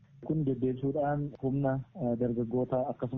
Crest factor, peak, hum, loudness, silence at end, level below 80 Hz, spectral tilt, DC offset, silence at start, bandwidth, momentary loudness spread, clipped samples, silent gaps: 14 dB; -18 dBFS; none; -32 LUFS; 0 s; -58 dBFS; -10 dB/octave; under 0.1%; 0.2 s; 3.8 kHz; 3 LU; under 0.1%; none